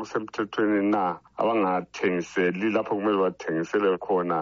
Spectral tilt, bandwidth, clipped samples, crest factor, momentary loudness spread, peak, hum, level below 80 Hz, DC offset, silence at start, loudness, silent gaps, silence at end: -4.5 dB/octave; 7.6 kHz; under 0.1%; 14 dB; 6 LU; -10 dBFS; none; -68 dBFS; under 0.1%; 0 s; -26 LUFS; none; 0 s